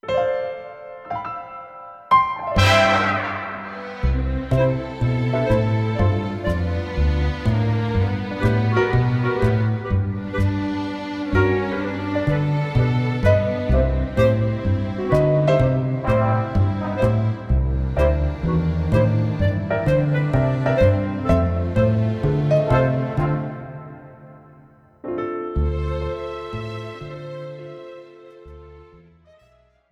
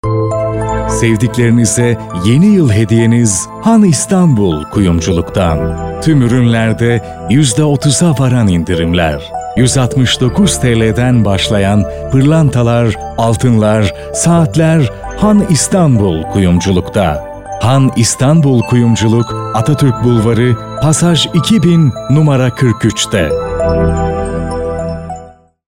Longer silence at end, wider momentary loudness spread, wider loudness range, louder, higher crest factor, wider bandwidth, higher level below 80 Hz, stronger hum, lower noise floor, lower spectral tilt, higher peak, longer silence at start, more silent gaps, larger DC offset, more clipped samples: first, 1.1 s vs 0.45 s; first, 14 LU vs 6 LU; first, 9 LU vs 2 LU; second, -21 LUFS vs -11 LUFS; first, 18 dB vs 10 dB; second, 9.8 kHz vs 16 kHz; about the same, -30 dBFS vs -28 dBFS; neither; first, -57 dBFS vs -35 dBFS; first, -7.5 dB/octave vs -5.5 dB/octave; about the same, -2 dBFS vs 0 dBFS; about the same, 0.05 s vs 0.05 s; neither; second, under 0.1% vs 0.4%; neither